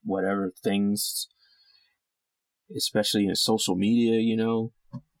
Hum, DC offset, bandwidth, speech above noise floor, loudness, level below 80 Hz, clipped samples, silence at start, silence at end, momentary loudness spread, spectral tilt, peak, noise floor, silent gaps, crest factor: none; under 0.1%; 17.5 kHz; 60 dB; -25 LUFS; -70 dBFS; under 0.1%; 0.05 s; 0.2 s; 14 LU; -4 dB/octave; -12 dBFS; -85 dBFS; none; 16 dB